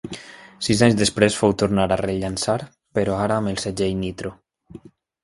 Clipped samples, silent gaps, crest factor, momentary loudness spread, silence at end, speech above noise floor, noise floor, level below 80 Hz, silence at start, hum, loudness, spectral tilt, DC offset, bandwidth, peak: under 0.1%; none; 20 dB; 15 LU; 0.45 s; 24 dB; -45 dBFS; -46 dBFS; 0.05 s; none; -21 LUFS; -5 dB/octave; under 0.1%; 11.5 kHz; -2 dBFS